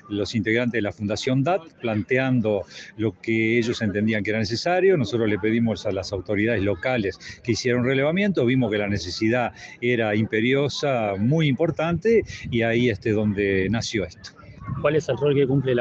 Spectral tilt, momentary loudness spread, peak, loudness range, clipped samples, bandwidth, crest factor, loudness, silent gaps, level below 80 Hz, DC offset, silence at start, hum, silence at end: -6 dB/octave; 7 LU; -8 dBFS; 2 LU; under 0.1%; 8.2 kHz; 16 dB; -23 LUFS; none; -52 dBFS; under 0.1%; 0.05 s; none; 0 s